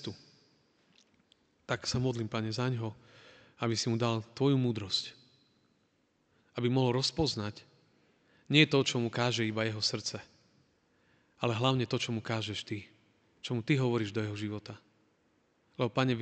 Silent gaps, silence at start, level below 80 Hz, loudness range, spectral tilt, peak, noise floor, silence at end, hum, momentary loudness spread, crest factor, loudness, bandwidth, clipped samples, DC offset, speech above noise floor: none; 0 s; -64 dBFS; 6 LU; -5 dB/octave; -8 dBFS; -73 dBFS; 0 s; none; 14 LU; 26 dB; -32 LUFS; 9 kHz; under 0.1%; under 0.1%; 42 dB